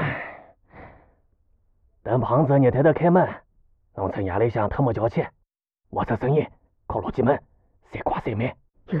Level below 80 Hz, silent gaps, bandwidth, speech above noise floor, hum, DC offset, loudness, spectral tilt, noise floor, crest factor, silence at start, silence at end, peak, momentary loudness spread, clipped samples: -48 dBFS; none; 5.2 kHz; 50 dB; none; under 0.1%; -23 LUFS; -10.5 dB/octave; -72 dBFS; 18 dB; 0 s; 0 s; -6 dBFS; 15 LU; under 0.1%